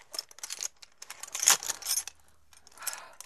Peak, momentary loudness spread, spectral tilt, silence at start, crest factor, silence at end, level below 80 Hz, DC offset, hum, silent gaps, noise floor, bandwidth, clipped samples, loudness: -4 dBFS; 21 LU; 3 dB/octave; 0.1 s; 32 dB; 0.15 s; -72 dBFS; under 0.1%; none; none; -62 dBFS; 14 kHz; under 0.1%; -29 LUFS